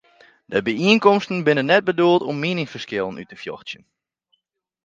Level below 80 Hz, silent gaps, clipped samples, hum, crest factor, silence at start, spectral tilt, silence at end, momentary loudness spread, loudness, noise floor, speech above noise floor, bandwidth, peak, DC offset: -64 dBFS; none; under 0.1%; none; 20 dB; 0.5 s; -6 dB/octave; 1.1 s; 18 LU; -19 LUFS; -74 dBFS; 55 dB; 7.6 kHz; 0 dBFS; under 0.1%